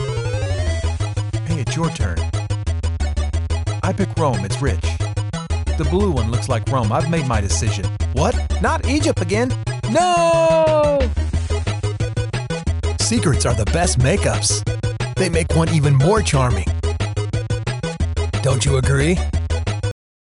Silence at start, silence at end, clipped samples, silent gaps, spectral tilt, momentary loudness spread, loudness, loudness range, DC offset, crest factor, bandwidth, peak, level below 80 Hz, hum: 0 s; 0.3 s; under 0.1%; none; -5.5 dB/octave; 8 LU; -19 LUFS; 4 LU; under 0.1%; 12 dB; 11.5 kHz; -6 dBFS; -28 dBFS; none